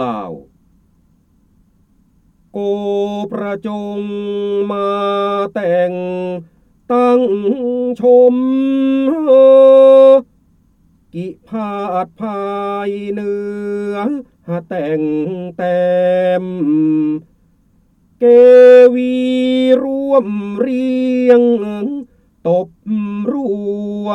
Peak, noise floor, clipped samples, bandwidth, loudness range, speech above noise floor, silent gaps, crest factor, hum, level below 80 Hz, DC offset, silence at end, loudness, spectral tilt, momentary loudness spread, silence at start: 0 dBFS; -54 dBFS; under 0.1%; 5.8 kHz; 12 LU; 41 dB; none; 14 dB; none; -56 dBFS; under 0.1%; 0 s; -13 LUFS; -8 dB/octave; 16 LU; 0 s